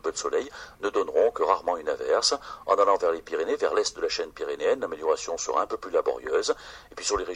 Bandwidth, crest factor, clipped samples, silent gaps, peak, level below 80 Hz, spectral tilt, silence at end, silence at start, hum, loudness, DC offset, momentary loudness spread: 12 kHz; 20 dB; under 0.1%; none; -6 dBFS; -56 dBFS; -1.5 dB/octave; 0 s; 0.05 s; none; -26 LUFS; under 0.1%; 8 LU